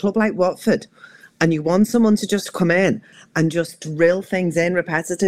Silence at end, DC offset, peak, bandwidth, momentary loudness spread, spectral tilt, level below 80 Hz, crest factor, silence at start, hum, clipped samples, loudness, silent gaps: 0 s; 0.3%; -2 dBFS; 16 kHz; 7 LU; -6 dB/octave; -58 dBFS; 18 dB; 0 s; none; under 0.1%; -19 LUFS; none